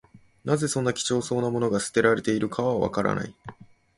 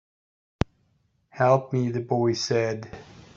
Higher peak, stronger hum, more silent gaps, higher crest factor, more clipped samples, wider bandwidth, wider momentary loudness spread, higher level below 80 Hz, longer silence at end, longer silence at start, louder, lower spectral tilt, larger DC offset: about the same, -6 dBFS vs -4 dBFS; neither; neither; about the same, 20 dB vs 24 dB; neither; first, 11.5 kHz vs 7.6 kHz; about the same, 14 LU vs 13 LU; second, -56 dBFS vs -50 dBFS; first, 0.35 s vs 0.15 s; second, 0.15 s vs 1.35 s; about the same, -25 LUFS vs -25 LUFS; about the same, -5 dB/octave vs -6 dB/octave; neither